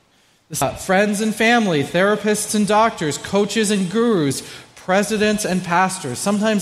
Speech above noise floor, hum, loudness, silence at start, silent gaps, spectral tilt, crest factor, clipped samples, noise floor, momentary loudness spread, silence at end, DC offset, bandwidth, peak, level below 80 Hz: 39 dB; none; -18 LUFS; 0.5 s; none; -4 dB/octave; 16 dB; under 0.1%; -57 dBFS; 7 LU; 0 s; under 0.1%; 15 kHz; -2 dBFS; -52 dBFS